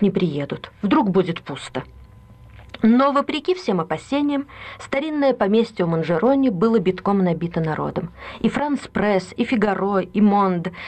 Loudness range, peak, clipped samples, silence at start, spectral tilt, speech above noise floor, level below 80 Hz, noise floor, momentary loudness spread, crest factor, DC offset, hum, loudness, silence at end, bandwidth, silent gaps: 2 LU; -8 dBFS; under 0.1%; 0 s; -7.5 dB/octave; 25 dB; -50 dBFS; -45 dBFS; 12 LU; 12 dB; under 0.1%; none; -20 LUFS; 0 s; 8.8 kHz; none